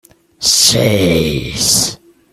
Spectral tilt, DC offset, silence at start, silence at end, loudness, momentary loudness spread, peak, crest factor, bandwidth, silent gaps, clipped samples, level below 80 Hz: -3 dB/octave; under 0.1%; 0.4 s; 0.35 s; -11 LUFS; 8 LU; 0 dBFS; 14 dB; over 20 kHz; none; under 0.1%; -38 dBFS